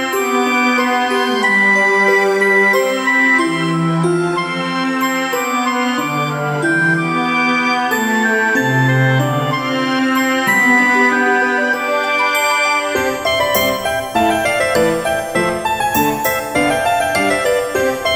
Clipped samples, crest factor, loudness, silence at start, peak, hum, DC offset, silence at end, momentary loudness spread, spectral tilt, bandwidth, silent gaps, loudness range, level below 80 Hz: under 0.1%; 14 dB; -14 LUFS; 0 s; -2 dBFS; none; under 0.1%; 0 s; 6 LU; -4.5 dB/octave; over 20 kHz; none; 3 LU; -48 dBFS